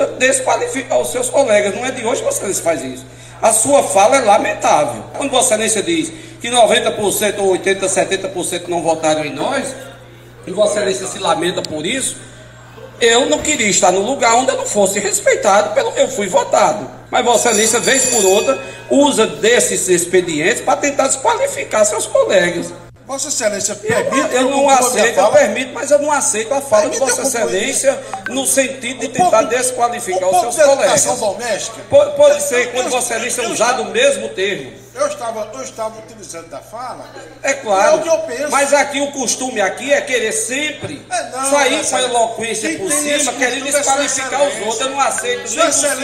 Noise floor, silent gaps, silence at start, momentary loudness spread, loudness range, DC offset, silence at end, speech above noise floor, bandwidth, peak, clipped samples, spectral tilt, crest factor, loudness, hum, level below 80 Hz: -38 dBFS; none; 0 s; 11 LU; 5 LU; under 0.1%; 0 s; 23 dB; 16 kHz; 0 dBFS; under 0.1%; -2 dB/octave; 16 dB; -14 LUFS; none; -52 dBFS